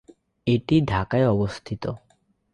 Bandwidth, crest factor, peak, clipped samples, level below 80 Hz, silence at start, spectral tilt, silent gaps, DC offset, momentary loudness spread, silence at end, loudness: 10.5 kHz; 16 dB; -8 dBFS; under 0.1%; -46 dBFS; 0.45 s; -8 dB/octave; none; under 0.1%; 11 LU; 0.55 s; -24 LUFS